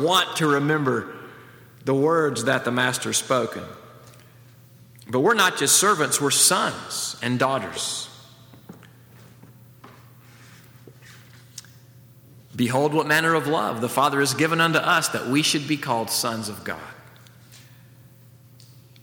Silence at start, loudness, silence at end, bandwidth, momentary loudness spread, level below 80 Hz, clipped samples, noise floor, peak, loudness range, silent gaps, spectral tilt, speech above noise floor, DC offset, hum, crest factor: 0 s; -21 LUFS; 0.35 s; over 20 kHz; 19 LU; -68 dBFS; under 0.1%; -50 dBFS; -4 dBFS; 10 LU; none; -3 dB/octave; 28 dB; under 0.1%; none; 20 dB